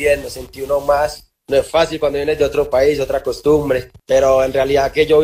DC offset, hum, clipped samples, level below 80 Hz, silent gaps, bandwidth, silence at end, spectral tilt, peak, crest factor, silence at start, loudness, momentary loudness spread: under 0.1%; none; under 0.1%; -38 dBFS; none; 16 kHz; 0 s; -5 dB/octave; -2 dBFS; 14 dB; 0 s; -16 LUFS; 7 LU